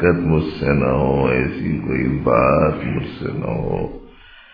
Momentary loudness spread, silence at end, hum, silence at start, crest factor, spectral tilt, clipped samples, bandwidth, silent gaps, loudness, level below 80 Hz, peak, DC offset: 10 LU; 0.45 s; none; 0 s; 16 dB; -10.5 dB/octave; under 0.1%; 5.2 kHz; none; -19 LUFS; -34 dBFS; -2 dBFS; under 0.1%